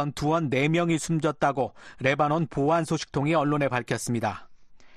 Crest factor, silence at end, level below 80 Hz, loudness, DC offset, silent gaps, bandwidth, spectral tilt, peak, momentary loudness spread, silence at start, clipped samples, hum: 16 dB; 0 s; -54 dBFS; -26 LUFS; under 0.1%; none; 13 kHz; -6 dB/octave; -10 dBFS; 6 LU; 0 s; under 0.1%; none